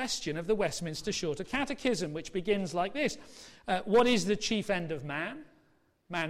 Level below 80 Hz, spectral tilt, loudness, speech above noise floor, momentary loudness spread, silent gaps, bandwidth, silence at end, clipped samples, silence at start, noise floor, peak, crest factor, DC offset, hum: -56 dBFS; -4 dB/octave; -31 LUFS; 37 dB; 11 LU; none; 15 kHz; 0 s; under 0.1%; 0 s; -69 dBFS; -16 dBFS; 16 dB; under 0.1%; none